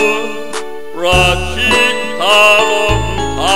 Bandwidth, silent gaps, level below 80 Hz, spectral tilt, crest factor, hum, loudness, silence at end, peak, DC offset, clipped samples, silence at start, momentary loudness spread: 16.5 kHz; none; -26 dBFS; -3 dB/octave; 14 dB; none; -11 LUFS; 0 s; 0 dBFS; 6%; under 0.1%; 0 s; 15 LU